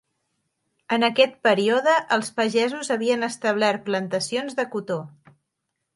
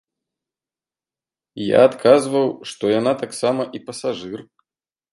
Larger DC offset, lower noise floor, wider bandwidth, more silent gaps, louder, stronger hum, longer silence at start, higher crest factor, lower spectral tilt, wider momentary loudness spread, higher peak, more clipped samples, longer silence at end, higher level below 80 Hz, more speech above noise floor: neither; second, -79 dBFS vs under -90 dBFS; about the same, 11.5 kHz vs 11.5 kHz; neither; second, -22 LUFS vs -19 LUFS; neither; second, 0.9 s vs 1.55 s; about the same, 20 dB vs 20 dB; about the same, -4 dB/octave vs -5 dB/octave; second, 8 LU vs 14 LU; second, -4 dBFS vs 0 dBFS; neither; first, 0.85 s vs 0.7 s; second, -74 dBFS vs -66 dBFS; second, 57 dB vs over 72 dB